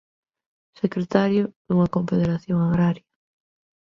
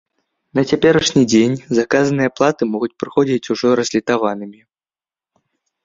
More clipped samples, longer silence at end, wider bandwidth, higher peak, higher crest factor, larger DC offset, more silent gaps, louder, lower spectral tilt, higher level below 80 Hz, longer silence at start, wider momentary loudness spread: neither; second, 0.95 s vs 1.3 s; second, 6.8 kHz vs 7.8 kHz; about the same, -2 dBFS vs 0 dBFS; about the same, 22 dB vs 18 dB; neither; first, 1.56-1.65 s vs none; second, -22 LUFS vs -16 LUFS; first, -9 dB/octave vs -5 dB/octave; about the same, -54 dBFS vs -52 dBFS; first, 0.85 s vs 0.55 s; about the same, 7 LU vs 9 LU